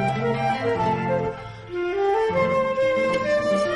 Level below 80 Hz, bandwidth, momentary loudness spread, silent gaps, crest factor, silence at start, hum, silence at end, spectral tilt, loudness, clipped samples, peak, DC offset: -50 dBFS; 11 kHz; 7 LU; none; 12 dB; 0 s; none; 0 s; -6.5 dB/octave; -23 LUFS; under 0.1%; -10 dBFS; under 0.1%